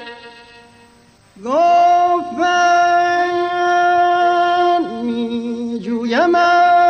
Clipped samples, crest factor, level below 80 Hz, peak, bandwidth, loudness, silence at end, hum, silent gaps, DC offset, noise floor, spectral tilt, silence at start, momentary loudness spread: under 0.1%; 12 dB; -58 dBFS; -4 dBFS; 8.6 kHz; -15 LUFS; 0 s; none; none; under 0.1%; -49 dBFS; -4 dB/octave; 0 s; 10 LU